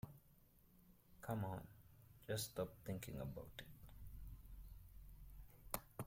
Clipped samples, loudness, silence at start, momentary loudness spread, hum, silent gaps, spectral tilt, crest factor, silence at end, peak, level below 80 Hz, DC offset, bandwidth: under 0.1%; -51 LUFS; 0.05 s; 17 LU; none; none; -5 dB/octave; 28 dB; 0 s; -24 dBFS; -62 dBFS; under 0.1%; 16.5 kHz